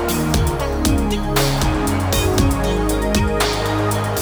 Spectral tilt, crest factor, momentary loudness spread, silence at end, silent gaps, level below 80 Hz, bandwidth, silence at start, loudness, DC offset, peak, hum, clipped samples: -5 dB/octave; 16 dB; 2 LU; 0 s; none; -24 dBFS; over 20 kHz; 0 s; -18 LUFS; under 0.1%; -2 dBFS; none; under 0.1%